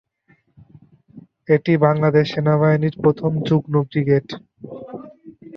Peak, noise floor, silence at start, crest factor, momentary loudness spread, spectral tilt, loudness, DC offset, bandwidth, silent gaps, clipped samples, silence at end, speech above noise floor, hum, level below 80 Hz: -2 dBFS; -60 dBFS; 1.15 s; 18 dB; 20 LU; -9 dB/octave; -18 LUFS; under 0.1%; 6.4 kHz; none; under 0.1%; 0 s; 42 dB; none; -58 dBFS